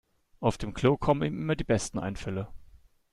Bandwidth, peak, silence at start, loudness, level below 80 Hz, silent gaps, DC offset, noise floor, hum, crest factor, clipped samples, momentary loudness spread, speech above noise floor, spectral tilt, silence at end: 12 kHz; -10 dBFS; 0.4 s; -29 LUFS; -46 dBFS; none; under 0.1%; -56 dBFS; none; 20 dB; under 0.1%; 10 LU; 27 dB; -6 dB/octave; 0.35 s